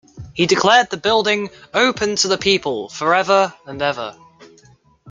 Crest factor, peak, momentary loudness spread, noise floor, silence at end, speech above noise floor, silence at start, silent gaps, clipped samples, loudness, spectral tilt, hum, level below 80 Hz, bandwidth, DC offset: 18 dB; 0 dBFS; 9 LU; -51 dBFS; 0 s; 34 dB; 0.15 s; none; under 0.1%; -17 LUFS; -3 dB/octave; none; -54 dBFS; 9.6 kHz; under 0.1%